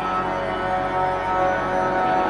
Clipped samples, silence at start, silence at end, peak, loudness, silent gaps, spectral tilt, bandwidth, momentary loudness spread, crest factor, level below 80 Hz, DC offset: under 0.1%; 0 s; 0 s; -8 dBFS; -22 LUFS; none; -6 dB/octave; 10.5 kHz; 3 LU; 12 dB; -44 dBFS; under 0.1%